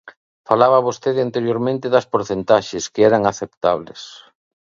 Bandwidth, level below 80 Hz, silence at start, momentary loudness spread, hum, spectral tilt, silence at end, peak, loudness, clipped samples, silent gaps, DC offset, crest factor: 7.6 kHz; -56 dBFS; 0.05 s; 11 LU; none; -5 dB/octave; 0.6 s; 0 dBFS; -18 LUFS; under 0.1%; 0.17-0.44 s, 3.57-3.61 s; under 0.1%; 18 dB